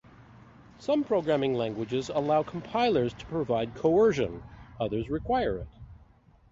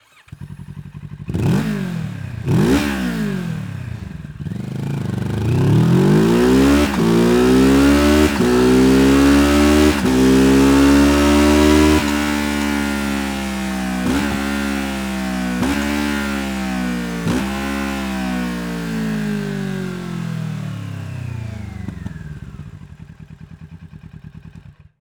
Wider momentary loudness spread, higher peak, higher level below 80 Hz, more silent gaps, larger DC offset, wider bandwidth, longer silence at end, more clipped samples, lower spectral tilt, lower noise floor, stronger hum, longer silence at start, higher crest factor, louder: second, 11 LU vs 18 LU; second, -12 dBFS vs -2 dBFS; second, -52 dBFS vs -30 dBFS; neither; neither; second, 7.8 kHz vs over 20 kHz; first, 0.55 s vs 0.3 s; neither; about the same, -6.5 dB/octave vs -6 dB/octave; first, -58 dBFS vs -42 dBFS; neither; second, 0.2 s vs 0.4 s; about the same, 18 dB vs 16 dB; second, -28 LUFS vs -16 LUFS